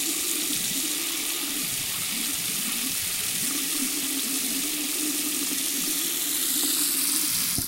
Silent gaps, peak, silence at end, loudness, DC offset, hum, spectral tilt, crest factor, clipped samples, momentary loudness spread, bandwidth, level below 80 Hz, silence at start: none; -6 dBFS; 0 s; -24 LUFS; under 0.1%; none; 0 dB/octave; 22 dB; under 0.1%; 4 LU; 16 kHz; -58 dBFS; 0 s